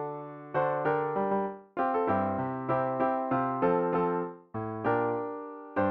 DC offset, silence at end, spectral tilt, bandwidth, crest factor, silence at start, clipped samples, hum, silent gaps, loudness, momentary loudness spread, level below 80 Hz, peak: under 0.1%; 0 s; -7 dB/octave; 5.2 kHz; 16 dB; 0 s; under 0.1%; none; none; -30 LUFS; 10 LU; -66 dBFS; -14 dBFS